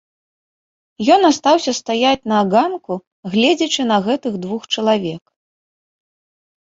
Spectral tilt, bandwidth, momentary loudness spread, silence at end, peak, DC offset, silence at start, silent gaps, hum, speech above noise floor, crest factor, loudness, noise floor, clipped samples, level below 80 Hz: -4 dB/octave; 7.8 kHz; 13 LU; 1.45 s; -2 dBFS; under 0.1%; 1 s; 3.07-3.23 s; none; over 74 dB; 18 dB; -16 LUFS; under -90 dBFS; under 0.1%; -58 dBFS